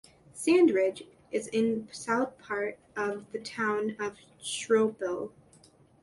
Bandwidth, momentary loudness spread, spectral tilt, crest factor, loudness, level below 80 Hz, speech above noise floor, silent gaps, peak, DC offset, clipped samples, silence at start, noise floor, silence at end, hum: 11.5 kHz; 14 LU; -4 dB/octave; 18 dB; -30 LUFS; -72 dBFS; 30 dB; none; -12 dBFS; under 0.1%; under 0.1%; 0.35 s; -60 dBFS; 0.75 s; none